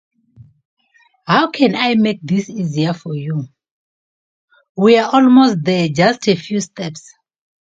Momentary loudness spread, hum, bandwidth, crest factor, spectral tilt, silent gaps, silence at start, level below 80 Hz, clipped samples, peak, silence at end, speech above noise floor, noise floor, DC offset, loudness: 16 LU; none; 7.8 kHz; 16 dB; -6 dB/octave; 3.71-4.48 s, 4.69-4.75 s; 1.25 s; -60 dBFS; under 0.1%; 0 dBFS; 0.8 s; 38 dB; -52 dBFS; under 0.1%; -15 LUFS